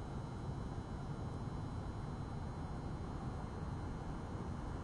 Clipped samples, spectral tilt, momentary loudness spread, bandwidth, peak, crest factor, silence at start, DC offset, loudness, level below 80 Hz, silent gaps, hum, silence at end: under 0.1%; -7.5 dB/octave; 1 LU; 11.5 kHz; -32 dBFS; 12 dB; 0 s; under 0.1%; -45 LUFS; -50 dBFS; none; none; 0 s